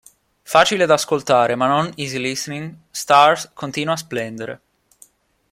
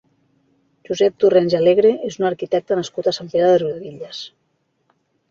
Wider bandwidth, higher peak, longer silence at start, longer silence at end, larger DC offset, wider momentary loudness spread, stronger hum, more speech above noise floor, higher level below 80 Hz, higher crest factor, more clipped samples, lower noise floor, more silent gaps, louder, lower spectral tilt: first, 16 kHz vs 7.6 kHz; about the same, 0 dBFS vs -2 dBFS; second, 0.5 s vs 0.9 s; about the same, 0.95 s vs 1 s; neither; about the same, 17 LU vs 17 LU; neither; second, 34 dB vs 50 dB; about the same, -60 dBFS vs -62 dBFS; about the same, 18 dB vs 16 dB; neither; second, -52 dBFS vs -68 dBFS; neither; about the same, -18 LUFS vs -18 LUFS; second, -3.5 dB/octave vs -6 dB/octave